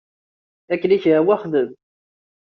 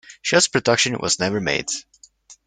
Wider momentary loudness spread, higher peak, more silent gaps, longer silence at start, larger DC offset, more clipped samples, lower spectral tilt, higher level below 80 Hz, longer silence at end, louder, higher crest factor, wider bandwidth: about the same, 10 LU vs 8 LU; about the same, -4 dBFS vs -2 dBFS; neither; first, 0.7 s vs 0.1 s; neither; neither; first, -5.5 dB/octave vs -2.5 dB/octave; second, -68 dBFS vs -56 dBFS; first, 0.65 s vs 0.15 s; about the same, -19 LUFS vs -19 LUFS; about the same, 16 dB vs 20 dB; second, 5.8 kHz vs 10.5 kHz